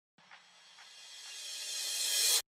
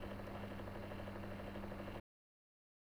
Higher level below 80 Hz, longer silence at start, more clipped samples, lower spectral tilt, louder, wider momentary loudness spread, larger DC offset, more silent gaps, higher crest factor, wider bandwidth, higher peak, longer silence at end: second, under -90 dBFS vs -58 dBFS; first, 0.3 s vs 0 s; neither; second, 5 dB/octave vs -7 dB/octave; first, -32 LUFS vs -49 LUFS; first, 23 LU vs 2 LU; neither; neither; first, 20 dB vs 14 dB; second, 16 kHz vs over 20 kHz; first, -16 dBFS vs -36 dBFS; second, 0.15 s vs 1 s